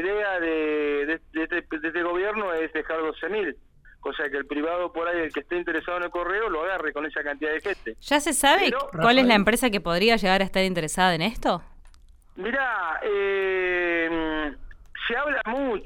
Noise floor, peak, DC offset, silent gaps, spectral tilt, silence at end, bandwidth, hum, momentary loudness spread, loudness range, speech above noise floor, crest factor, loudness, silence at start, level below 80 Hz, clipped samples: -51 dBFS; -6 dBFS; under 0.1%; none; -3.5 dB/octave; 0 s; 16 kHz; none; 10 LU; 7 LU; 26 dB; 20 dB; -24 LUFS; 0 s; -46 dBFS; under 0.1%